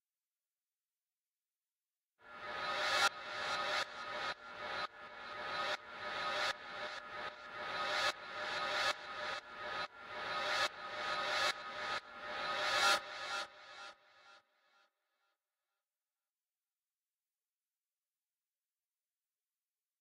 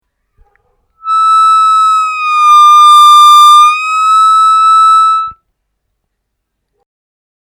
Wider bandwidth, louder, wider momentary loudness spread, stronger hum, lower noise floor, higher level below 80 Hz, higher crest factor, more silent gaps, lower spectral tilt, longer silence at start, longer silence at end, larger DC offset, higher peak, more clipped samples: about the same, 16 kHz vs 17.5 kHz; second, -38 LUFS vs -4 LUFS; first, 12 LU vs 9 LU; neither; first, under -90 dBFS vs -69 dBFS; second, -78 dBFS vs -58 dBFS; first, 22 dB vs 8 dB; neither; first, -0.5 dB/octave vs 5 dB/octave; first, 2.25 s vs 1.05 s; first, 5.6 s vs 2.15 s; neither; second, -20 dBFS vs 0 dBFS; neither